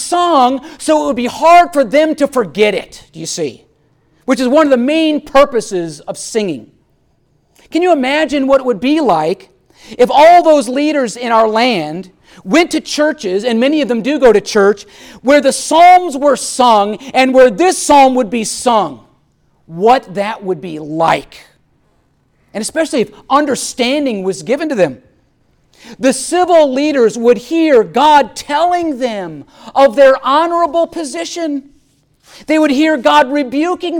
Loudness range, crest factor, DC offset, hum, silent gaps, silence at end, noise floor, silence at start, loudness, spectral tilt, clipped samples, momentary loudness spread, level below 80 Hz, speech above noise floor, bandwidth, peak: 6 LU; 12 dB; under 0.1%; none; none; 0 s; -56 dBFS; 0 s; -12 LUFS; -3.5 dB/octave; under 0.1%; 13 LU; -48 dBFS; 45 dB; 17.5 kHz; 0 dBFS